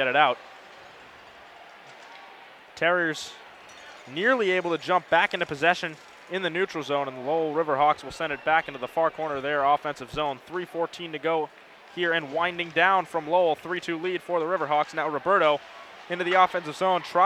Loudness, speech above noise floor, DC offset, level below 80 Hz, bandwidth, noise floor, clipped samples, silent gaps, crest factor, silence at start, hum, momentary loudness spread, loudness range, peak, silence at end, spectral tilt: -25 LUFS; 23 dB; under 0.1%; -64 dBFS; 14.5 kHz; -48 dBFS; under 0.1%; none; 22 dB; 0 s; none; 22 LU; 4 LU; -4 dBFS; 0 s; -4.5 dB/octave